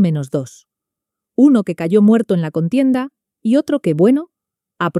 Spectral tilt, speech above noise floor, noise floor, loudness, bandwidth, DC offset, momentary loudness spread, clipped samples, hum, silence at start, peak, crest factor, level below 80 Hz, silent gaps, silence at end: -8 dB/octave; 69 dB; -83 dBFS; -16 LUFS; 12 kHz; under 0.1%; 12 LU; under 0.1%; none; 0 s; -2 dBFS; 14 dB; -62 dBFS; none; 0 s